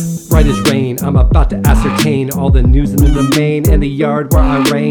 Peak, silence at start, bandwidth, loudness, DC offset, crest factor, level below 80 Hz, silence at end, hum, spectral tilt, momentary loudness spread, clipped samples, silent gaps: 0 dBFS; 0 s; 19 kHz; -12 LUFS; under 0.1%; 10 dB; -14 dBFS; 0 s; none; -6 dB/octave; 3 LU; 0.2%; none